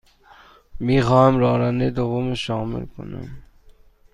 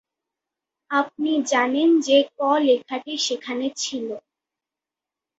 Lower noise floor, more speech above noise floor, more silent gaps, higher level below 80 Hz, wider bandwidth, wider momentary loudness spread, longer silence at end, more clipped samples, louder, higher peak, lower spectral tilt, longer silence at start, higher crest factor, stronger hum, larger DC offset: second, -50 dBFS vs -88 dBFS; second, 30 dB vs 67 dB; neither; first, -42 dBFS vs -72 dBFS; first, 10.5 kHz vs 8 kHz; first, 19 LU vs 10 LU; second, 0.7 s vs 1.2 s; neither; about the same, -20 LUFS vs -21 LUFS; about the same, -4 dBFS vs -6 dBFS; first, -7.5 dB/octave vs -2 dB/octave; second, 0.75 s vs 0.9 s; about the same, 18 dB vs 18 dB; neither; neither